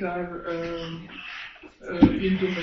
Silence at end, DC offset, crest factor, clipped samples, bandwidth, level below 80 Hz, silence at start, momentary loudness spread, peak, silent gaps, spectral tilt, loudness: 0 s; under 0.1%; 20 dB; under 0.1%; 6.4 kHz; -44 dBFS; 0 s; 17 LU; -6 dBFS; none; -7.5 dB/octave; -26 LUFS